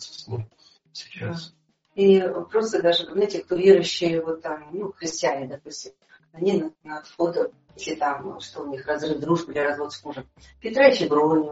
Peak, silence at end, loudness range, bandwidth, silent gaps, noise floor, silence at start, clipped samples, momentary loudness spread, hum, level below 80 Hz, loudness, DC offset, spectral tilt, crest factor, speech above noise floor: -4 dBFS; 0 s; 7 LU; 8 kHz; none; -57 dBFS; 0 s; under 0.1%; 20 LU; none; -62 dBFS; -23 LUFS; under 0.1%; -4 dB/octave; 20 dB; 33 dB